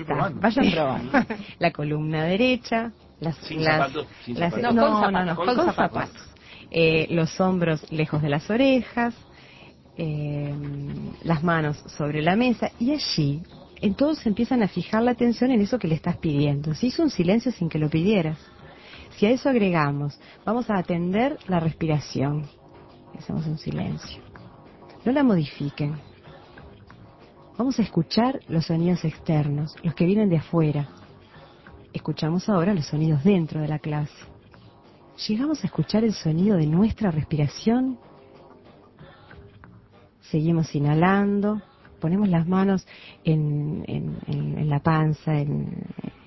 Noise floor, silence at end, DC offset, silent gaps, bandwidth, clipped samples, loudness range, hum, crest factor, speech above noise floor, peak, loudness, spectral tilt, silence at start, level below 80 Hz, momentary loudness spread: -53 dBFS; 0.15 s; under 0.1%; none; 6.2 kHz; under 0.1%; 5 LU; none; 18 dB; 30 dB; -6 dBFS; -24 LUFS; -7.5 dB/octave; 0 s; -50 dBFS; 12 LU